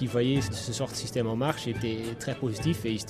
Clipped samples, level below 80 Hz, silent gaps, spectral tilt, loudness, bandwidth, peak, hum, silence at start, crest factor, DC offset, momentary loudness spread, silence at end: under 0.1%; -52 dBFS; none; -5.5 dB/octave; -30 LUFS; 15 kHz; -10 dBFS; none; 0 s; 20 dB; under 0.1%; 6 LU; 0 s